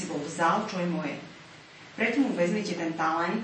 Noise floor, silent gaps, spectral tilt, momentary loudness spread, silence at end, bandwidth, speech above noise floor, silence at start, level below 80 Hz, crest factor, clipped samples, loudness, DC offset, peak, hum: -49 dBFS; none; -5.5 dB/octave; 20 LU; 0 s; 8.8 kHz; 21 dB; 0 s; -72 dBFS; 16 dB; under 0.1%; -28 LUFS; under 0.1%; -12 dBFS; none